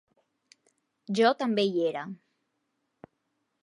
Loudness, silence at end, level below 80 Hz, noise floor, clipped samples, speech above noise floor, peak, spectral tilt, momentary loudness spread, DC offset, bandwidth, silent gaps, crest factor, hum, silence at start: -27 LUFS; 1.45 s; -84 dBFS; -79 dBFS; under 0.1%; 52 dB; -10 dBFS; -5.5 dB/octave; 17 LU; under 0.1%; 11 kHz; none; 22 dB; none; 1.1 s